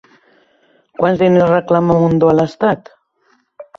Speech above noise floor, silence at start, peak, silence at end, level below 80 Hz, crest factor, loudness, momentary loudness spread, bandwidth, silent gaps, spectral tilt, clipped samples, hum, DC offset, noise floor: 46 dB; 1 s; -2 dBFS; 0.15 s; -48 dBFS; 14 dB; -13 LUFS; 6 LU; 7.2 kHz; none; -8.5 dB/octave; under 0.1%; none; under 0.1%; -59 dBFS